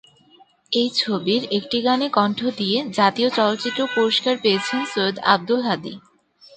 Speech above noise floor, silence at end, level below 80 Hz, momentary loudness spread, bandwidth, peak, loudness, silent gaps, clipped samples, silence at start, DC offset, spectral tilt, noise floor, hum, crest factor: 33 dB; 0.6 s; -66 dBFS; 5 LU; 9.2 kHz; 0 dBFS; -20 LUFS; none; under 0.1%; 0.7 s; under 0.1%; -4.5 dB/octave; -54 dBFS; none; 20 dB